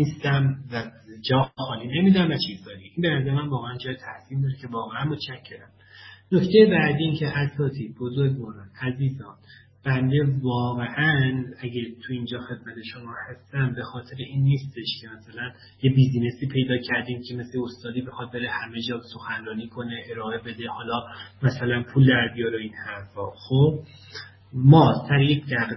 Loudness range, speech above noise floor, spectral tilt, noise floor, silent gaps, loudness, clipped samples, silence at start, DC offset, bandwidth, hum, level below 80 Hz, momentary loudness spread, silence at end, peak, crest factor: 8 LU; 24 dB; -8.5 dB/octave; -48 dBFS; none; -24 LUFS; under 0.1%; 0 s; under 0.1%; 6 kHz; none; -54 dBFS; 17 LU; 0 s; -2 dBFS; 22 dB